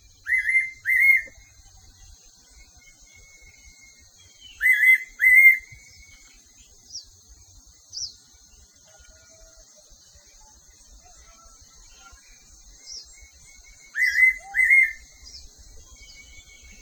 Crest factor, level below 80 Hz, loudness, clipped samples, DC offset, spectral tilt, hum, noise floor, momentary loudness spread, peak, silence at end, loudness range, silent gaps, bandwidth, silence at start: 20 dB; -54 dBFS; -17 LUFS; under 0.1%; under 0.1%; 1 dB/octave; none; -53 dBFS; 25 LU; -4 dBFS; 1.45 s; 22 LU; none; 19 kHz; 0.25 s